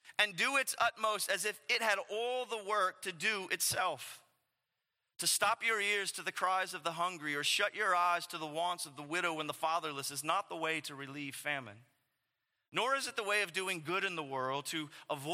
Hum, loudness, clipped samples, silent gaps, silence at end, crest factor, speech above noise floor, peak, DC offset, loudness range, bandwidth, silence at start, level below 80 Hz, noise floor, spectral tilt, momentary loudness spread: none; -34 LUFS; under 0.1%; none; 0 s; 22 dB; 52 dB; -14 dBFS; under 0.1%; 4 LU; 16.5 kHz; 0.05 s; -86 dBFS; -87 dBFS; -1.5 dB/octave; 9 LU